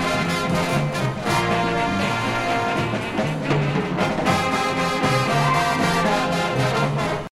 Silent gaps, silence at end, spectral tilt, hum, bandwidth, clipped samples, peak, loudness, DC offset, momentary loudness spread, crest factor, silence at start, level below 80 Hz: none; 0.1 s; -5 dB/octave; none; 15.5 kHz; under 0.1%; -4 dBFS; -21 LUFS; under 0.1%; 4 LU; 16 dB; 0 s; -46 dBFS